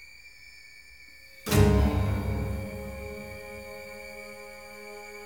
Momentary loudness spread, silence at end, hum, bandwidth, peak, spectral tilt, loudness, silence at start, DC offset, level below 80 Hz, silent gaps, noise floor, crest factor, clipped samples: 25 LU; 0 s; 60 Hz at -55 dBFS; over 20 kHz; -8 dBFS; -6 dB/octave; -29 LUFS; 0 s; 0.2%; -36 dBFS; none; -51 dBFS; 22 dB; under 0.1%